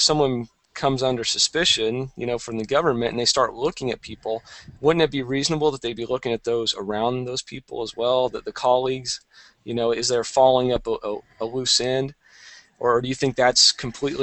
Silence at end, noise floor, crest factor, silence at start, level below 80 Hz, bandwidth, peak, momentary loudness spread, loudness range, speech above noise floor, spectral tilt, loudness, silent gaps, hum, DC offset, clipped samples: 0 s; -48 dBFS; 20 dB; 0 s; -50 dBFS; 8.8 kHz; -4 dBFS; 13 LU; 3 LU; 26 dB; -3 dB/octave; -22 LUFS; none; none; under 0.1%; under 0.1%